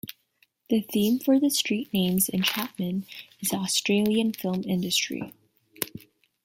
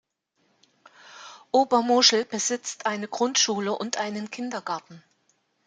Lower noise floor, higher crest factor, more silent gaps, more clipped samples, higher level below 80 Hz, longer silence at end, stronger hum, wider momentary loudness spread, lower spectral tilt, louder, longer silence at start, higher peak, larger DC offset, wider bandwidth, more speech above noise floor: second, -67 dBFS vs -71 dBFS; about the same, 22 dB vs 24 dB; neither; neither; first, -66 dBFS vs -76 dBFS; second, 0.45 s vs 0.7 s; neither; second, 12 LU vs 16 LU; first, -4 dB/octave vs -2 dB/octave; about the same, -26 LUFS vs -24 LUFS; second, 0.7 s vs 1.05 s; about the same, -4 dBFS vs -4 dBFS; neither; first, 16.5 kHz vs 11 kHz; second, 42 dB vs 46 dB